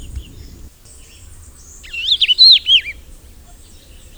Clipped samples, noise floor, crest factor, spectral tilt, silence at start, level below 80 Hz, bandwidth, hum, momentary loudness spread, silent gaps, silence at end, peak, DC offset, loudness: under 0.1%; -41 dBFS; 18 dB; 0 dB/octave; 0 s; -38 dBFS; over 20 kHz; none; 27 LU; none; 1.25 s; 0 dBFS; under 0.1%; -9 LUFS